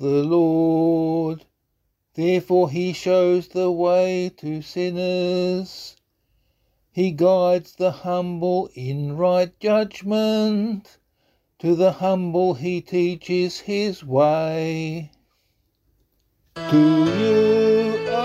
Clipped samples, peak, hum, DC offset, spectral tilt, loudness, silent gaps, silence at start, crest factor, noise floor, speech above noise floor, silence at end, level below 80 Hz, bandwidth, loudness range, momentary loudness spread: under 0.1%; -6 dBFS; none; under 0.1%; -7 dB/octave; -21 LUFS; none; 0 s; 16 dB; -72 dBFS; 52 dB; 0 s; -62 dBFS; 13 kHz; 3 LU; 11 LU